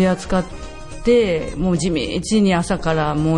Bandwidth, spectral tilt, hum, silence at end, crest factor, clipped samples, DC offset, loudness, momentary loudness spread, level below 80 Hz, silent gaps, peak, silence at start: 11 kHz; -6 dB/octave; none; 0 s; 14 dB; under 0.1%; under 0.1%; -19 LUFS; 9 LU; -34 dBFS; none; -4 dBFS; 0 s